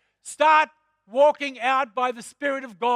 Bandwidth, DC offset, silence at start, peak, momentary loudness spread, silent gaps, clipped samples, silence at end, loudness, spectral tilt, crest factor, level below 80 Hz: 12 kHz; under 0.1%; 0.25 s; -6 dBFS; 11 LU; none; under 0.1%; 0 s; -22 LUFS; -2 dB/octave; 16 dB; -80 dBFS